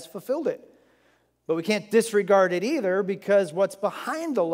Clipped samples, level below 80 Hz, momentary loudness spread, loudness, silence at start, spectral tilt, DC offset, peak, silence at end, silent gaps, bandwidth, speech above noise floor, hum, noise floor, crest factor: under 0.1%; -80 dBFS; 10 LU; -24 LUFS; 0 s; -5 dB/octave; under 0.1%; -8 dBFS; 0 s; none; 16 kHz; 41 dB; none; -65 dBFS; 18 dB